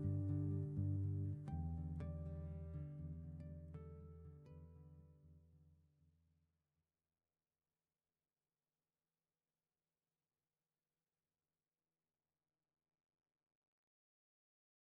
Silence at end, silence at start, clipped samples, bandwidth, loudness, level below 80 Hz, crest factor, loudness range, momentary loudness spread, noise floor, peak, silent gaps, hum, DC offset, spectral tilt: 9.3 s; 0 s; under 0.1%; 2.5 kHz; -47 LUFS; -64 dBFS; 18 dB; 20 LU; 19 LU; under -90 dBFS; -32 dBFS; none; none; under 0.1%; -11 dB/octave